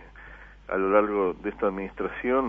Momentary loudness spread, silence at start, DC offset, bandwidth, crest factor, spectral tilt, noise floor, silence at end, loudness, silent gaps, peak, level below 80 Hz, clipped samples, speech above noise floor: 24 LU; 0 s; under 0.1%; 3.7 kHz; 20 dB; -8.5 dB/octave; -47 dBFS; 0 s; -26 LUFS; none; -8 dBFS; -50 dBFS; under 0.1%; 21 dB